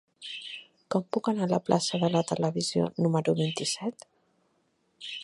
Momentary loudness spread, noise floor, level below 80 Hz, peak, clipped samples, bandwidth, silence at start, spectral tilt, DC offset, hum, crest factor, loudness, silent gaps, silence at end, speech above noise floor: 13 LU; -72 dBFS; -70 dBFS; -8 dBFS; under 0.1%; 11.5 kHz; 0.2 s; -5 dB/octave; under 0.1%; none; 22 dB; -28 LUFS; none; 0 s; 44 dB